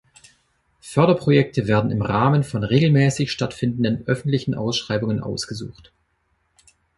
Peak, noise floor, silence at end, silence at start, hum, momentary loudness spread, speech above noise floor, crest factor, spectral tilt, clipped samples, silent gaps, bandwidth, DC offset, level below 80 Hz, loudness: -2 dBFS; -68 dBFS; 1.25 s; 0.85 s; none; 9 LU; 48 dB; 18 dB; -6.5 dB/octave; under 0.1%; none; 11.5 kHz; under 0.1%; -50 dBFS; -20 LUFS